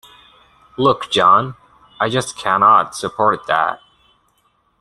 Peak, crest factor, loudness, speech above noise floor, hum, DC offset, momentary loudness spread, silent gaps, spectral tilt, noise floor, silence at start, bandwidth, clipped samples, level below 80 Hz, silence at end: 0 dBFS; 18 dB; -16 LUFS; 46 dB; none; under 0.1%; 12 LU; none; -4 dB/octave; -62 dBFS; 0.8 s; 12.5 kHz; under 0.1%; -56 dBFS; 1.05 s